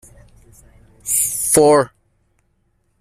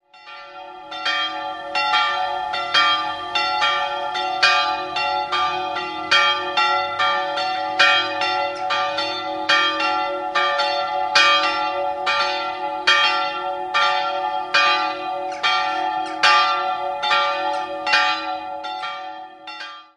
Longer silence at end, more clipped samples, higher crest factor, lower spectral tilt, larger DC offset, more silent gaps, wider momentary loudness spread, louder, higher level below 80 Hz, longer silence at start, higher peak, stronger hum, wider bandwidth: first, 1.15 s vs 0.15 s; neither; about the same, 18 dB vs 20 dB; first, -3.5 dB/octave vs -1 dB/octave; neither; neither; about the same, 14 LU vs 12 LU; first, -15 LUFS vs -19 LUFS; first, -52 dBFS vs -62 dBFS; first, 1.05 s vs 0.15 s; about the same, -2 dBFS vs 0 dBFS; neither; first, 16 kHz vs 11.5 kHz